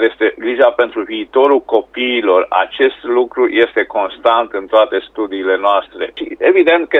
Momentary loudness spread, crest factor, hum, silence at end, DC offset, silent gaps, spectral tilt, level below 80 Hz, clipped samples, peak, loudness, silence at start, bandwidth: 7 LU; 14 dB; none; 0 s; under 0.1%; none; -5 dB/octave; -56 dBFS; under 0.1%; 0 dBFS; -14 LUFS; 0 s; 4.1 kHz